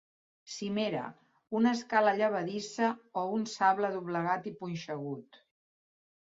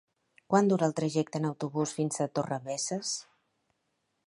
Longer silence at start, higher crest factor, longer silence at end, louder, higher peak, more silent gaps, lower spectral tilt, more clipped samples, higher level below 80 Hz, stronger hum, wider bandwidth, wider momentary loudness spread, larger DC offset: about the same, 0.45 s vs 0.5 s; about the same, 20 dB vs 22 dB; about the same, 1 s vs 1.05 s; about the same, -32 LUFS vs -30 LUFS; about the same, -12 dBFS vs -10 dBFS; neither; about the same, -5 dB/octave vs -5 dB/octave; neither; about the same, -78 dBFS vs -76 dBFS; neither; second, 7.8 kHz vs 11.5 kHz; first, 12 LU vs 7 LU; neither